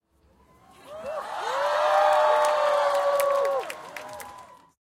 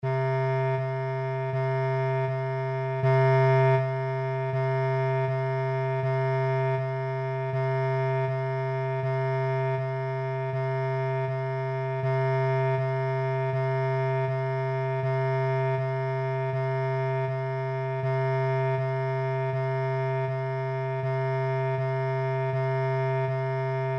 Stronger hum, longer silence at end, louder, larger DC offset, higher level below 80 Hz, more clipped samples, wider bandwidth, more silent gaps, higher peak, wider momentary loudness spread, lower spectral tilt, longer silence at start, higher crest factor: neither; first, 0.45 s vs 0 s; first, -23 LUFS vs -27 LUFS; neither; about the same, -70 dBFS vs -72 dBFS; neither; first, 16.5 kHz vs 5.8 kHz; neither; first, -8 dBFS vs -14 dBFS; first, 19 LU vs 4 LU; second, -1 dB/octave vs -9 dB/octave; first, 0.85 s vs 0 s; first, 18 dB vs 12 dB